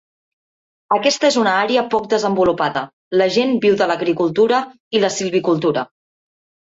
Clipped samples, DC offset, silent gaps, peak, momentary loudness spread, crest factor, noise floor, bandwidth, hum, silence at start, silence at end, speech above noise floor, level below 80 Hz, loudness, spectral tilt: under 0.1%; under 0.1%; 2.93-3.11 s, 4.80-4.91 s; -2 dBFS; 6 LU; 14 dB; under -90 dBFS; 8 kHz; none; 0.9 s; 0.85 s; over 74 dB; -58 dBFS; -17 LUFS; -4 dB/octave